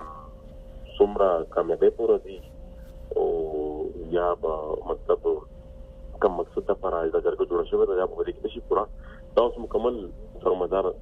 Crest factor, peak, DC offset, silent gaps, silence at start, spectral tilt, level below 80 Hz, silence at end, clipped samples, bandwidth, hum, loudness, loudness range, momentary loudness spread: 20 dB; -6 dBFS; under 0.1%; none; 0 s; -8 dB/octave; -44 dBFS; 0 s; under 0.1%; 4.6 kHz; none; -26 LUFS; 3 LU; 22 LU